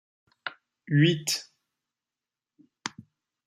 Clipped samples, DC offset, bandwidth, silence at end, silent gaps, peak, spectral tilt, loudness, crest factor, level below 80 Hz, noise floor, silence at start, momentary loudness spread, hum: under 0.1%; under 0.1%; 14.5 kHz; 0.6 s; none; -10 dBFS; -4.5 dB/octave; -27 LUFS; 22 dB; -74 dBFS; under -90 dBFS; 0.45 s; 17 LU; none